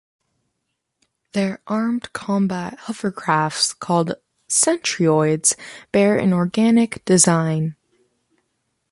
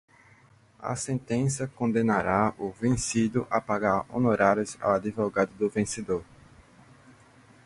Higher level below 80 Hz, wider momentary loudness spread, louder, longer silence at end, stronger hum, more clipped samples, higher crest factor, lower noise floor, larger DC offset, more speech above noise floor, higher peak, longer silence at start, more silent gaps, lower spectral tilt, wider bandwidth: second, -60 dBFS vs -54 dBFS; first, 11 LU vs 7 LU; first, -19 LUFS vs -27 LUFS; second, 1.2 s vs 1.45 s; neither; neither; about the same, 18 dB vs 22 dB; first, -76 dBFS vs -58 dBFS; neither; first, 57 dB vs 32 dB; first, -2 dBFS vs -6 dBFS; first, 1.35 s vs 0.8 s; neither; second, -4 dB/octave vs -5.5 dB/octave; about the same, 12 kHz vs 11.5 kHz